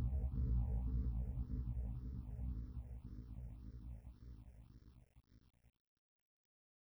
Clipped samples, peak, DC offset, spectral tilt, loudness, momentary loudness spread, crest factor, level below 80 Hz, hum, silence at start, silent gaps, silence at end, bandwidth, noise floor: under 0.1%; -30 dBFS; under 0.1%; -10.5 dB/octave; -45 LUFS; 20 LU; 14 dB; -46 dBFS; none; 0 s; none; 1.5 s; 2 kHz; -64 dBFS